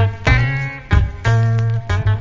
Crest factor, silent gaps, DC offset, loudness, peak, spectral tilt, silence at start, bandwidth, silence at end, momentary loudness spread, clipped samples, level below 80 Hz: 14 dB; none; under 0.1%; -17 LUFS; 0 dBFS; -6.5 dB/octave; 0 s; 7.6 kHz; 0 s; 4 LU; under 0.1%; -24 dBFS